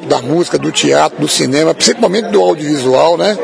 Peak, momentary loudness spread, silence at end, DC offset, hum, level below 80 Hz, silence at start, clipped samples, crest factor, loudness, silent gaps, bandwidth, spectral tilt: 0 dBFS; 4 LU; 0 s; under 0.1%; none; -56 dBFS; 0 s; 0.2%; 12 dB; -11 LUFS; none; 11 kHz; -3.5 dB/octave